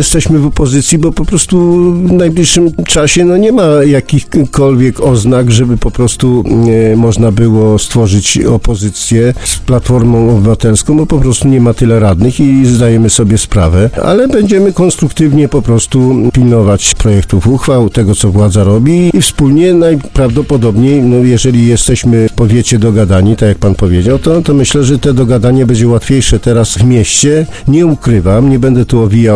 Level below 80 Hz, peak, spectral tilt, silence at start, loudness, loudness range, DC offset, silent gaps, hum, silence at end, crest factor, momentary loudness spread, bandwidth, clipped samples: -22 dBFS; 0 dBFS; -6 dB/octave; 0 s; -8 LUFS; 1 LU; 2%; none; none; 0 s; 6 dB; 3 LU; 11 kHz; 1%